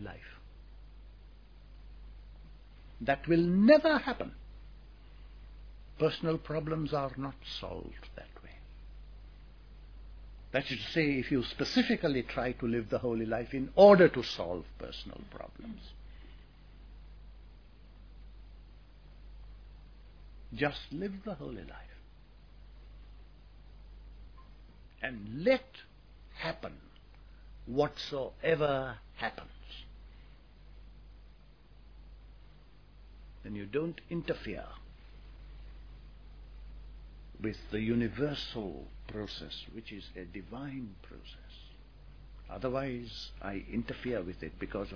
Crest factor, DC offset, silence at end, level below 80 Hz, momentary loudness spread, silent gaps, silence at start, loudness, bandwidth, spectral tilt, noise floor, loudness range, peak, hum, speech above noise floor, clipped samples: 28 dB; under 0.1%; 0 s; -52 dBFS; 25 LU; none; 0 s; -32 LUFS; 5.4 kHz; -4.5 dB/octave; -57 dBFS; 19 LU; -8 dBFS; none; 25 dB; under 0.1%